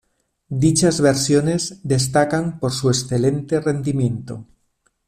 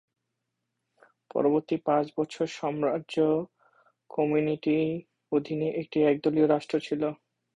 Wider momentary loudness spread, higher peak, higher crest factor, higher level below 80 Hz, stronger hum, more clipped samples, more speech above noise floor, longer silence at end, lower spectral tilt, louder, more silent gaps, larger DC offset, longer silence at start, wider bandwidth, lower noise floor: about the same, 8 LU vs 7 LU; first, -4 dBFS vs -10 dBFS; about the same, 16 dB vs 18 dB; first, -50 dBFS vs -70 dBFS; neither; neither; second, 48 dB vs 56 dB; first, 0.65 s vs 0.4 s; second, -5 dB/octave vs -7 dB/octave; first, -19 LUFS vs -28 LUFS; neither; neither; second, 0.5 s vs 1.35 s; first, 14.5 kHz vs 10 kHz; second, -66 dBFS vs -83 dBFS